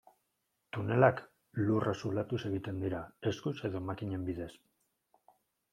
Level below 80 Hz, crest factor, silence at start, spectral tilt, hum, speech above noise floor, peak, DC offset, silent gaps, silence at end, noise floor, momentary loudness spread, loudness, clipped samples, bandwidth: -68 dBFS; 26 dB; 0.75 s; -7.5 dB/octave; none; 48 dB; -10 dBFS; under 0.1%; none; 1.2 s; -82 dBFS; 15 LU; -35 LUFS; under 0.1%; 13 kHz